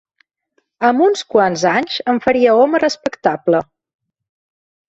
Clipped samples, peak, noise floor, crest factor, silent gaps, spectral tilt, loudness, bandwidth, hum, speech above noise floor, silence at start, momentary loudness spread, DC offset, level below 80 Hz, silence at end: under 0.1%; -2 dBFS; -66 dBFS; 16 dB; none; -4.5 dB/octave; -15 LUFS; 8.2 kHz; none; 52 dB; 0.8 s; 7 LU; under 0.1%; -58 dBFS; 1.25 s